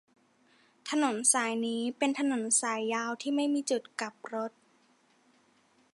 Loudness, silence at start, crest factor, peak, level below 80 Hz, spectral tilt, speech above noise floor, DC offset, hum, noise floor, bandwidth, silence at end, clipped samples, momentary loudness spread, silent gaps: -30 LUFS; 0.85 s; 20 dB; -12 dBFS; -88 dBFS; -1.5 dB/octave; 37 dB; under 0.1%; none; -67 dBFS; 11.5 kHz; 1.45 s; under 0.1%; 12 LU; none